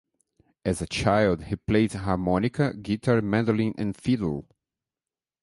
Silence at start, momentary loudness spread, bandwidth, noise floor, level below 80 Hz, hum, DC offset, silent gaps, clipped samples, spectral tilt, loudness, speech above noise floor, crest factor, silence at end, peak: 0.65 s; 7 LU; 11.5 kHz; under -90 dBFS; -46 dBFS; none; under 0.1%; none; under 0.1%; -6.5 dB/octave; -25 LUFS; over 65 dB; 18 dB; 1 s; -8 dBFS